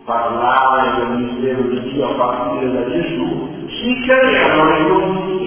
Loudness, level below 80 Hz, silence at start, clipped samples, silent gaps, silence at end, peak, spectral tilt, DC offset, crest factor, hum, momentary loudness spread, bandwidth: -16 LUFS; -44 dBFS; 0.05 s; under 0.1%; none; 0 s; 0 dBFS; -9.5 dB/octave; under 0.1%; 16 dB; none; 8 LU; 4 kHz